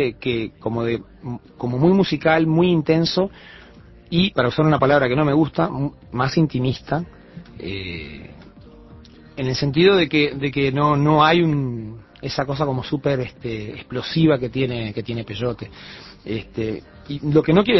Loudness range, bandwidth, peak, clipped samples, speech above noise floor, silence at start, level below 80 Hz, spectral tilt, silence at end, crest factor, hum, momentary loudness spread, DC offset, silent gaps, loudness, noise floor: 6 LU; 6 kHz; -2 dBFS; under 0.1%; 25 dB; 0 s; -46 dBFS; -7.5 dB/octave; 0 s; 18 dB; none; 17 LU; under 0.1%; none; -20 LUFS; -45 dBFS